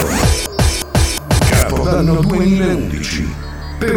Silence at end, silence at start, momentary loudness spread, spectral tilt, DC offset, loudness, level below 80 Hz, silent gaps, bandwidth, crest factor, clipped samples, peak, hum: 0 s; 0 s; 8 LU; -5 dB/octave; under 0.1%; -15 LUFS; -22 dBFS; none; 19.5 kHz; 14 dB; under 0.1%; 0 dBFS; none